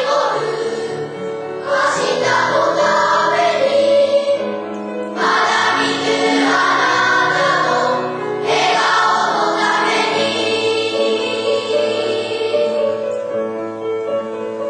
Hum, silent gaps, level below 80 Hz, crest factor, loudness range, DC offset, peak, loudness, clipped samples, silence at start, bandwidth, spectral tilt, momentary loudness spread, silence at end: none; none; -64 dBFS; 12 dB; 3 LU; under 0.1%; -4 dBFS; -16 LUFS; under 0.1%; 0 s; 11 kHz; -3 dB/octave; 10 LU; 0 s